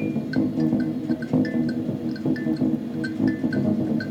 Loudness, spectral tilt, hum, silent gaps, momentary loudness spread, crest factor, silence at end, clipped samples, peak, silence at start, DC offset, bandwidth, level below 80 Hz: -24 LUFS; -8.5 dB/octave; none; none; 4 LU; 14 dB; 0 s; under 0.1%; -8 dBFS; 0 s; under 0.1%; 8.8 kHz; -56 dBFS